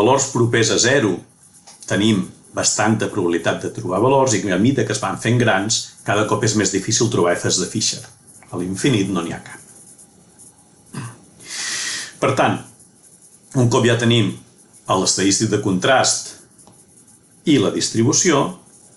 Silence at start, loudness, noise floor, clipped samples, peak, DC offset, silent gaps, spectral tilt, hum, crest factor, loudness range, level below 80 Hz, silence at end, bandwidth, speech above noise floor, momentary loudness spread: 0 s; -18 LUFS; -49 dBFS; under 0.1%; -4 dBFS; under 0.1%; none; -4 dB/octave; none; 16 dB; 7 LU; -54 dBFS; 0.4 s; 12 kHz; 32 dB; 14 LU